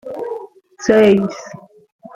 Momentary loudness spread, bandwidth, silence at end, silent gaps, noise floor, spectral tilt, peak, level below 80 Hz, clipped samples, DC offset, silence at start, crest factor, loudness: 21 LU; 8 kHz; 0.6 s; none; -34 dBFS; -6 dB/octave; 0 dBFS; -54 dBFS; under 0.1%; under 0.1%; 0.05 s; 18 dB; -15 LUFS